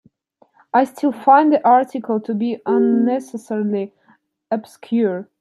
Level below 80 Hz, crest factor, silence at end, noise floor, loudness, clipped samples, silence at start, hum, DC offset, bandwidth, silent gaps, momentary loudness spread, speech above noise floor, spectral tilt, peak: -74 dBFS; 16 dB; 0.2 s; -58 dBFS; -18 LUFS; under 0.1%; 0.75 s; none; under 0.1%; 12.5 kHz; none; 13 LU; 41 dB; -7 dB/octave; -2 dBFS